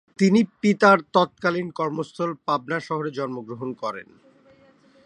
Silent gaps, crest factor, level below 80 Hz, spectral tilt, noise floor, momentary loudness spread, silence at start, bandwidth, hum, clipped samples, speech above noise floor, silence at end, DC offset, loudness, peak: none; 22 dB; -70 dBFS; -6.5 dB/octave; -56 dBFS; 15 LU; 0.2 s; 10 kHz; none; under 0.1%; 33 dB; 1.05 s; under 0.1%; -23 LUFS; -2 dBFS